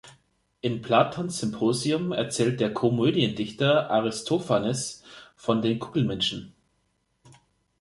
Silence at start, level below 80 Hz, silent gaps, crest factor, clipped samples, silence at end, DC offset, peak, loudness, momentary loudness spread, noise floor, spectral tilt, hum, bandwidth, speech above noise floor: 0.05 s; -62 dBFS; none; 20 dB; under 0.1%; 1.3 s; under 0.1%; -6 dBFS; -26 LUFS; 8 LU; -72 dBFS; -5 dB/octave; none; 11.5 kHz; 47 dB